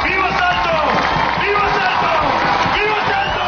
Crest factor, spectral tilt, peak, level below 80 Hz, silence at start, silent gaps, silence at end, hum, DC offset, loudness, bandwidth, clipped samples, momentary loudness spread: 16 dB; -1.5 dB/octave; 0 dBFS; -36 dBFS; 0 s; none; 0 s; none; 0.3%; -15 LUFS; 6.8 kHz; under 0.1%; 1 LU